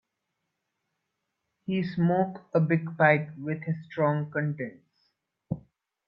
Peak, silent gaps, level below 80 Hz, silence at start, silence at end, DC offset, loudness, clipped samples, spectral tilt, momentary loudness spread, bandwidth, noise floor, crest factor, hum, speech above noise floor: -6 dBFS; none; -68 dBFS; 1.7 s; 0.5 s; under 0.1%; -28 LUFS; under 0.1%; -10.5 dB/octave; 15 LU; 5.6 kHz; -82 dBFS; 22 dB; none; 55 dB